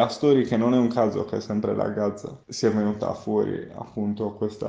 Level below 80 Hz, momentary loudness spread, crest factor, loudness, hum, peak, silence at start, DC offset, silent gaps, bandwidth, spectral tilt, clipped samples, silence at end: -60 dBFS; 10 LU; 18 dB; -24 LUFS; none; -6 dBFS; 0 s; under 0.1%; none; 9 kHz; -6.5 dB/octave; under 0.1%; 0 s